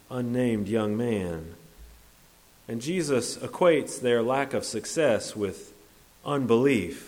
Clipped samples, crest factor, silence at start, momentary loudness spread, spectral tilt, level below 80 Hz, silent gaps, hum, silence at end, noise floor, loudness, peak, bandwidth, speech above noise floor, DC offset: under 0.1%; 18 dB; 0.1 s; 12 LU; -5 dB/octave; -58 dBFS; none; none; 0 s; -57 dBFS; -26 LUFS; -10 dBFS; 17.5 kHz; 30 dB; under 0.1%